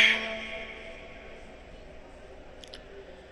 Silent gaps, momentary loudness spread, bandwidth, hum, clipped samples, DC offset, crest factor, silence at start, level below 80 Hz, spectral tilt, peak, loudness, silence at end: none; 18 LU; 12 kHz; none; under 0.1%; under 0.1%; 24 dB; 0 s; -52 dBFS; -1.5 dB/octave; -8 dBFS; -30 LUFS; 0 s